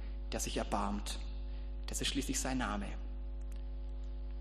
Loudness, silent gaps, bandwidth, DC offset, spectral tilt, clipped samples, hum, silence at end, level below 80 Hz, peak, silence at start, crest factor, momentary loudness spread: -40 LUFS; none; 13 kHz; under 0.1%; -3.5 dB/octave; under 0.1%; none; 0 s; -42 dBFS; -20 dBFS; 0 s; 18 dB; 10 LU